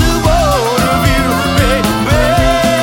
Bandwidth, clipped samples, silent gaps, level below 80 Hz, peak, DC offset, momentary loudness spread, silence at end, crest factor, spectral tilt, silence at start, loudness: 18 kHz; under 0.1%; none; -20 dBFS; 0 dBFS; under 0.1%; 2 LU; 0 s; 10 dB; -5 dB/octave; 0 s; -11 LUFS